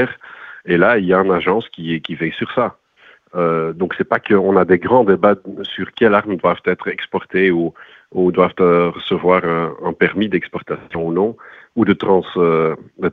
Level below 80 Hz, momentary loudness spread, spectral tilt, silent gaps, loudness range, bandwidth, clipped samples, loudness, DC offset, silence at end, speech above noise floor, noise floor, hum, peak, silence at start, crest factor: -52 dBFS; 11 LU; -9 dB/octave; none; 3 LU; 4.7 kHz; under 0.1%; -17 LUFS; under 0.1%; 0 s; 33 dB; -49 dBFS; none; 0 dBFS; 0 s; 16 dB